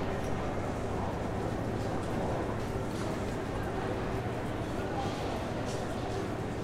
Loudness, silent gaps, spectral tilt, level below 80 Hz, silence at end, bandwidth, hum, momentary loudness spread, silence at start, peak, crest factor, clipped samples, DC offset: -35 LUFS; none; -6.5 dB/octave; -44 dBFS; 0 s; 16 kHz; none; 1 LU; 0 s; -20 dBFS; 14 dB; under 0.1%; under 0.1%